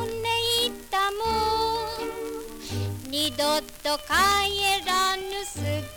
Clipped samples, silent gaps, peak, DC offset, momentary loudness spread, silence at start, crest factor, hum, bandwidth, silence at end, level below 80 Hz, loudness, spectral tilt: under 0.1%; none; -10 dBFS; under 0.1%; 11 LU; 0 s; 16 dB; none; over 20 kHz; 0 s; -46 dBFS; -25 LUFS; -2.5 dB/octave